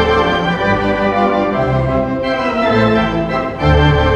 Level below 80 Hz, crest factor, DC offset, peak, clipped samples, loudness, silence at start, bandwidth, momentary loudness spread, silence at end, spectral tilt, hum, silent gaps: -26 dBFS; 14 dB; under 0.1%; 0 dBFS; under 0.1%; -14 LUFS; 0 s; 8.4 kHz; 5 LU; 0 s; -7.5 dB/octave; none; none